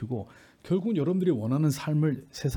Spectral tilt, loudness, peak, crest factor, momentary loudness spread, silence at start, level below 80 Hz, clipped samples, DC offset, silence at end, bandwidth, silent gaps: -7.5 dB/octave; -28 LUFS; -14 dBFS; 12 dB; 9 LU; 0 s; -62 dBFS; under 0.1%; under 0.1%; 0 s; 18 kHz; none